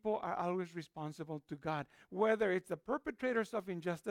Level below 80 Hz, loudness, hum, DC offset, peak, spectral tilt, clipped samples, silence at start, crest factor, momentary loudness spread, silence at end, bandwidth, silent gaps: -72 dBFS; -39 LUFS; none; under 0.1%; -20 dBFS; -6.5 dB/octave; under 0.1%; 0.05 s; 18 dB; 11 LU; 0 s; 15.5 kHz; none